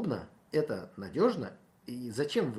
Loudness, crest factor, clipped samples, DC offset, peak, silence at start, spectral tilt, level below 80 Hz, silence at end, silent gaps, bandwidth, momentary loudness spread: -33 LUFS; 20 dB; under 0.1%; under 0.1%; -14 dBFS; 0 s; -6.5 dB/octave; -70 dBFS; 0 s; none; 14 kHz; 14 LU